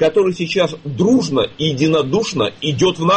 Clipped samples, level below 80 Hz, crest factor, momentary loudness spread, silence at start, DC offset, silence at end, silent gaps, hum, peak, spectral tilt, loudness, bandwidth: under 0.1%; -50 dBFS; 12 dB; 4 LU; 0 s; under 0.1%; 0 s; none; none; -4 dBFS; -5.5 dB/octave; -17 LUFS; 8.8 kHz